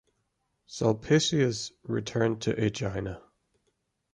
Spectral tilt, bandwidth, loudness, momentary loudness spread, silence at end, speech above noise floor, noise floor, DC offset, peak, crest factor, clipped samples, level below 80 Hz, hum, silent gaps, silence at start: -5 dB/octave; 11 kHz; -28 LUFS; 13 LU; 0.95 s; 49 dB; -77 dBFS; under 0.1%; -10 dBFS; 20 dB; under 0.1%; -56 dBFS; none; none; 0.7 s